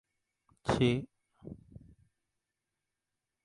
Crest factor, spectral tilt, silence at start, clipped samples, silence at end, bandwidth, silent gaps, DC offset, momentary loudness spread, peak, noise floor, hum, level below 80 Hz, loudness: 22 dB; -6.5 dB/octave; 0.65 s; under 0.1%; 1.9 s; 11.5 kHz; none; under 0.1%; 23 LU; -16 dBFS; -88 dBFS; none; -58 dBFS; -32 LUFS